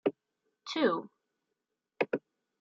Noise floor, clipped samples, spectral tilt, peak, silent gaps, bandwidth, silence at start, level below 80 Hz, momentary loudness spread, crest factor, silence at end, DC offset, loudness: -86 dBFS; under 0.1%; -5 dB/octave; -14 dBFS; none; 7.4 kHz; 0.05 s; -86 dBFS; 16 LU; 22 dB; 0.45 s; under 0.1%; -34 LUFS